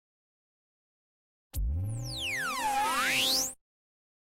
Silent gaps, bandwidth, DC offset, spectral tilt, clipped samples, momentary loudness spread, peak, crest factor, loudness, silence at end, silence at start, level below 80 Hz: none; 16 kHz; under 0.1%; -2 dB/octave; under 0.1%; 10 LU; -18 dBFS; 16 dB; -29 LUFS; 0.75 s; 1.55 s; -44 dBFS